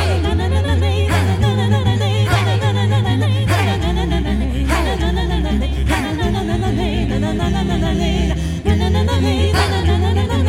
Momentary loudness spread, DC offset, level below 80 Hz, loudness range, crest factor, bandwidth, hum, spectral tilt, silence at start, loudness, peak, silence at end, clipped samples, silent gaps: 3 LU; under 0.1%; -22 dBFS; 2 LU; 14 dB; 15 kHz; none; -6.5 dB/octave; 0 s; -17 LUFS; -2 dBFS; 0 s; under 0.1%; none